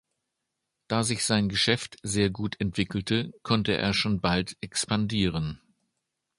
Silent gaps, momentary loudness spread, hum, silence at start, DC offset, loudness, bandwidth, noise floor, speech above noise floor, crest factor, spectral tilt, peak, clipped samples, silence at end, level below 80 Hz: none; 6 LU; none; 0.9 s; under 0.1%; -27 LUFS; 11.5 kHz; -83 dBFS; 56 dB; 22 dB; -4.5 dB/octave; -8 dBFS; under 0.1%; 0.85 s; -50 dBFS